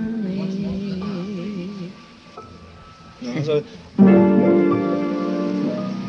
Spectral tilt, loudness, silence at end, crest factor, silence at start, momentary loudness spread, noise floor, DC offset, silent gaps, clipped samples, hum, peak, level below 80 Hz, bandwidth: -8.5 dB/octave; -20 LUFS; 0 s; 18 dB; 0 s; 20 LU; -43 dBFS; under 0.1%; none; under 0.1%; none; -2 dBFS; -54 dBFS; 6.6 kHz